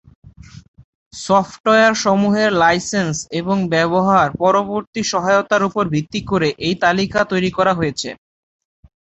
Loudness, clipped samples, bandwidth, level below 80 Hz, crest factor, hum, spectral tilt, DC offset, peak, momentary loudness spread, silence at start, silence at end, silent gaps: -16 LUFS; under 0.1%; 8.2 kHz; -48 dBFS; 16 dB; none; -4.5 dB/octave; under 0.1%; -2 dBFS; 8 LU; 0.55 s; 1.05 s; 0.68-0.74 s, 0.84-1.11 s, 1.60-1.64 s, 4.87-4.93 s